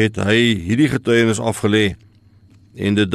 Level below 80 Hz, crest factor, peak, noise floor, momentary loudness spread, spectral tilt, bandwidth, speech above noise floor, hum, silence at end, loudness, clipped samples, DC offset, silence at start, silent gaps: -46 dBFS; 14 dB; -4 dBFS; -49 dBFS; 5 LU; -5.5 dB/octave; 13 kHz; 33 dB; none; 0 s; -17 LUFS; under 0.1%; under 0.1%; 0 s; none